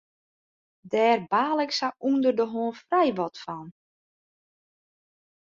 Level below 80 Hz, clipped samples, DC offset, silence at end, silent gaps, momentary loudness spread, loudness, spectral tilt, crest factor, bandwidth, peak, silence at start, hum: -74 dBFS; under 0.1%; under 0.1%; 1.7 s; none; 10 LU; -25 LUFS; -5 dB/octave; 18 dB; 7.6 kHz; -10 dBFS; 0.85 s; none